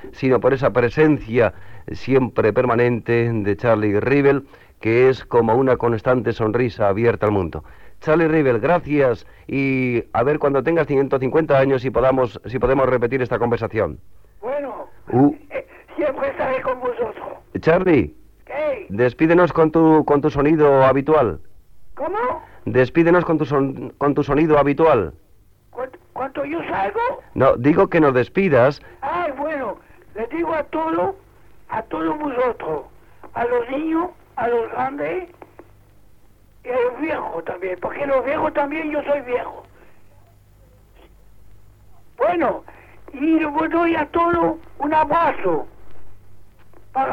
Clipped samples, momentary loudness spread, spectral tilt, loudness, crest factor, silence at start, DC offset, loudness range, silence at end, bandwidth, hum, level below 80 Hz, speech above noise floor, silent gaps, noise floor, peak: under 0.1%; 13 LU; -9 dB/octave; -19 LUFS; 16 dB; 0 s; under 0.1%; 8 LU; 0 s; 6.8 kHz; none; -44 dBFS; 34 dB; none; -52 dBFS; -2 dBFS